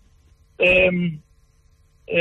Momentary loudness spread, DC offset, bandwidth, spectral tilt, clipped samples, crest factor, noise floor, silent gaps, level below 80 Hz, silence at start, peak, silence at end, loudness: 14 LU; under 0.1%; 8.6 kHz; -7 dB/octave; under 0.1%; 16 dB; -57 dBFS; none; -46 dBFS; 0.6 s; -6 dBFS; 0 s; -18 LUFS